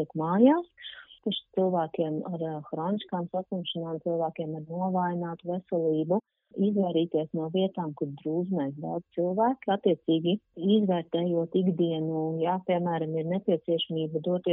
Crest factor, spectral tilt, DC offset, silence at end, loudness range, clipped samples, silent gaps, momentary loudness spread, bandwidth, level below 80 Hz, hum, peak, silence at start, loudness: 20 dB; -6 dB/octave; under 0.1%; 0 s; 4 LU; under 0.1%; none; 8 LU; 4 kHz; -76 dBFS; none; -8 dBFS; 0 s; -29 LUFS